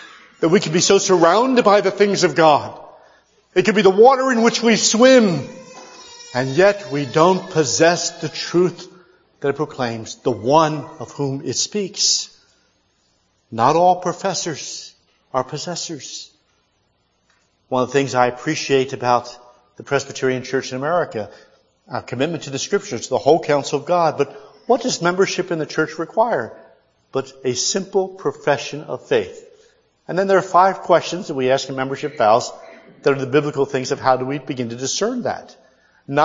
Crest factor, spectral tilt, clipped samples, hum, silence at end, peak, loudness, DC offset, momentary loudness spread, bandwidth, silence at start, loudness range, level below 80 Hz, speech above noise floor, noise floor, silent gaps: 18 dB; -4 dB/octave; under 0.1%; none; 0 s; 0 dBFS; -18 LUFS; under 0.1%; 14 LU; 7.8 kHz; 0 s; 8 LU; -64 dBFS; 47 dB; -65 dBFS; none